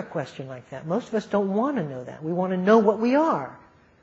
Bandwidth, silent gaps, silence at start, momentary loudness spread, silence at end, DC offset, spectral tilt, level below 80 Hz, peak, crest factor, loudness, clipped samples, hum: 7.8 kHz; none; 0 s; 18 LU; 0.45 s; under 0.1%; -7.5 dB/octave; -66 dBFS; -4 dBFS; 20 dB; -24 LUFS; under 0.1%; none